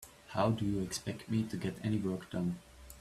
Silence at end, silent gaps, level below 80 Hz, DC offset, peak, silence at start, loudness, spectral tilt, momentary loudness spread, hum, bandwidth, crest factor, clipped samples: 0 s; none; -60 dBFS; under 0.1%; -16 dBFS; 0 s; -36 LUFS; -6 dB/octave; 8 LU; none; 15 kHz; 20 dB; under 0.1%